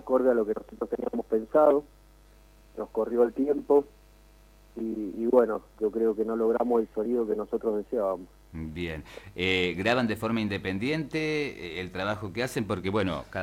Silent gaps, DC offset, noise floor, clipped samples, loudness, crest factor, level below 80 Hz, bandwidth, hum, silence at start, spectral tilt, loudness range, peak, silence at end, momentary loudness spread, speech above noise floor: none; under 0.1%; -55 dBFS; under 0.1%; -28 LUFS; 20 dB; -54 dBFS; 16 kHz; 50 Hz at -55 dBFS; 0.05 s; -6 dB/octave; 3 LU; -8 dBFS; 0 s; 12 LU; 28 dB